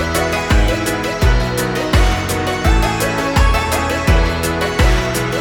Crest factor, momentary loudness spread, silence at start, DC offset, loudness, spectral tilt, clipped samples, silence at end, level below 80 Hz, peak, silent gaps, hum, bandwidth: 14 dB; 3 LU; 0 s; under 0.1%; -16 LUFS; -5 dB/octave; under 0.1%; 0 s; -18 dBFS; 0 dBFS; none; none; 19 kHz